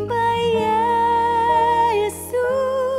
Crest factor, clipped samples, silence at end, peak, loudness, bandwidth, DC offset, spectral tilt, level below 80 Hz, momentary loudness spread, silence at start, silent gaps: 10 dB; under 0.1%; 0 s; -8 dBFS; -19 LUFS; 15.5 kHz; under 0.1%; -4.5 dB/octave; -50 dBFS; 5 LU; 0 s; none